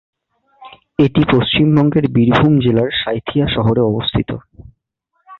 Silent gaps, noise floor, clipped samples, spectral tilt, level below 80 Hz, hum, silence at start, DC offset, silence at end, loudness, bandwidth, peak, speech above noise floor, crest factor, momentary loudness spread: none; -68 dBFS; under 0.1%; -9 dB/octave; -38 dBFS; none; 0.6 s; under 0.1%; 0.05 s; -14 LUFS; 6.2 kHz; 0 dBFS; 55 dB; 14 dB; 7 LU